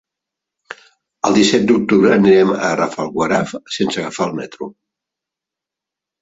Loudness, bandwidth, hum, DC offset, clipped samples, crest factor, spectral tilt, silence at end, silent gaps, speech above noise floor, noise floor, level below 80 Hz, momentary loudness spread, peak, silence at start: -15 LUFS; 8 kHz; none; under 0.1%; under 0.1%; 16 dB; -5 dB/octave; 1.5 s; none; 70 dB; -85 dBFS; -54 dBFS; 20 LU; 0 dBFS; 0.7 s